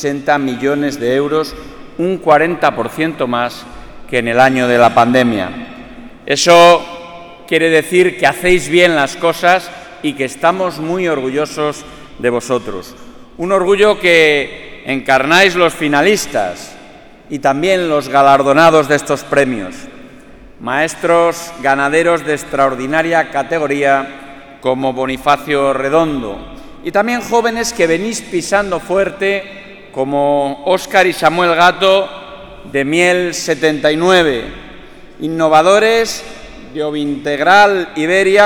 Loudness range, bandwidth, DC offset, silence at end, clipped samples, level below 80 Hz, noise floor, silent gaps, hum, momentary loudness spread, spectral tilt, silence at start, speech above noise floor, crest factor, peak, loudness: 4 LU; 19 kHz; under 0.1%; 0 s; under 0.1%; -42 dBFS; -38 dBFS; none; none; 18 LU; -4 dB/octave; 0 s; 25 dB; 14 dB; 0 dBFS; -13 LUFS